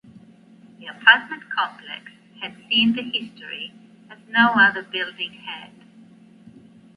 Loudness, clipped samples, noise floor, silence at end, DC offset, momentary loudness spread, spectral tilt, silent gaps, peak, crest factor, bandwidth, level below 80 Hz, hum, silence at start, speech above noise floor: -19 LUFS; under 0.1%; -49 dBFS; 1.3 s; under 0.1%; 21 LU; -5 dB/octave; none; 0 dBFS; 24 dB; 5.6 kHz; -72 dBFS; none; 0.8 s; 27 dB